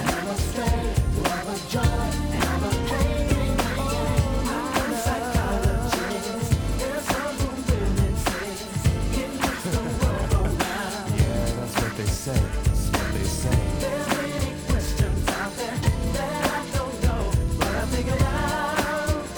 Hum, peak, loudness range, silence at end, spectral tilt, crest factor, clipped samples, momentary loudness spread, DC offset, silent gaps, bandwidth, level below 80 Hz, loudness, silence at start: none; -8 dBFS; 1 LU; 0 s; -5 dB/octave; 16 dB; under 0.1%; 4 LU; under 0.1%; none; over 20 kHz; -28 dBFS; -25 LUFS; 0 s